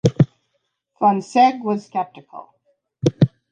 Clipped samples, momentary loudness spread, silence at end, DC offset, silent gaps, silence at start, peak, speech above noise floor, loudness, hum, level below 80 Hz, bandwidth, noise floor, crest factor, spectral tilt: under 0.1%; 20 LU; 0.25 s; under 0.1%; none; 0.05 s; -2 dBFS; 53 dB; -19 LUFS; none; -52 dBFS; 9.6 kHz; -72 dBFS; 18 dB; -7.5 dB/octave